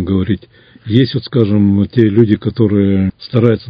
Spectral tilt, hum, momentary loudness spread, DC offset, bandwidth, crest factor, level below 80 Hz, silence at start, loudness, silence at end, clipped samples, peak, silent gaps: -10.5 dB/octave; none; 5 LU; under 0.1%; 5.2 kHz; 12 dB; -34 dBFS; 0 s; -13 LUFS; 0 s; 0.3%; 0 dBFS; none